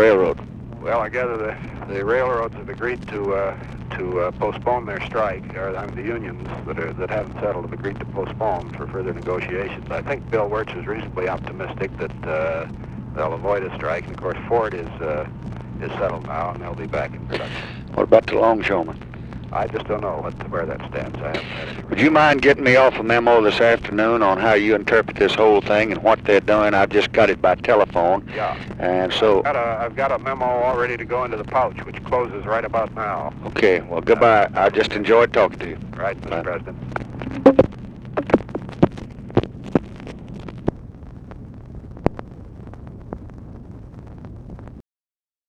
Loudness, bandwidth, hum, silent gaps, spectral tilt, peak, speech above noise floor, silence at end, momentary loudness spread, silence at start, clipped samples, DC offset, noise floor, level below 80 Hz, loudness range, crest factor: -20 LUFS; 9.8 kHz; none; none; -6.5 dB/octave; 0 dBFS; over 70 dB; 0.65 s; 19 LU; 0 s; under 0.1%; under 0.1%; under -90 dBFS; -42 dBFS; 11 LU; 20 dB